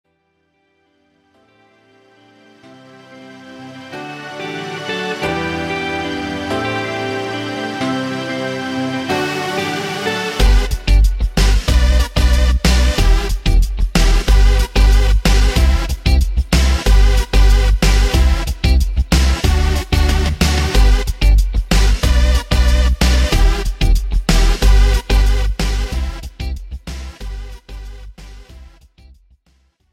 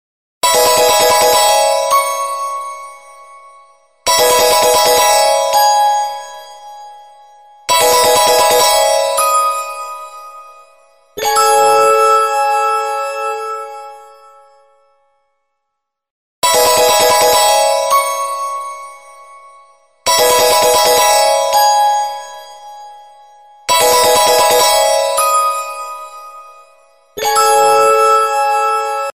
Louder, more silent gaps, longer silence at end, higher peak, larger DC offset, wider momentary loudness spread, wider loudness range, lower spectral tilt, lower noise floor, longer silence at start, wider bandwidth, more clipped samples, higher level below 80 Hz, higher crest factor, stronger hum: second, -16 LUFS vs -11 LUFS; second, none vs 16.11-16.42 s; first, 1.3 s vs 0.05 s; about the same, 0 dBFS vs 0 dBFS; neither; second, 14 LU vs 17 LU; first, 12 LU vs 3 LU; first, -5 dB/octave vs 0.5 dB/octave; second, -64 dBFS vs -75 dBFS; first, 3.1 s vs 0.45 s; about the same, 15 kHz vs 16 kHz; neither; first, -16 dBFS vs -48 dBFS; about the same, 14 dB vs 12 dB; neither